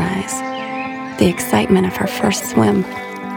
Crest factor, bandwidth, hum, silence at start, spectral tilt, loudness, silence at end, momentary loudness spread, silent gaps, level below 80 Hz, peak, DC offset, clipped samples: 16 dB; 18 kHz; none; 0 s; -5 dB/octave; -18 LUFS; 0 s; 10 LU; none; -44 dBFS; 0 dBFS; under 0.1%; under 0.1%